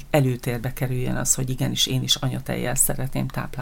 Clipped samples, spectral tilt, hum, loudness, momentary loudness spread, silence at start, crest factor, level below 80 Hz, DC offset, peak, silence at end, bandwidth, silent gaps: under 0.1%; -3.5 dB/octave; none; -23 LUFS; 7 LU; 0 s; 18 dB; -36 dBFS; under 0.1%; -4 dBFS; 0 s; 17 kHz; none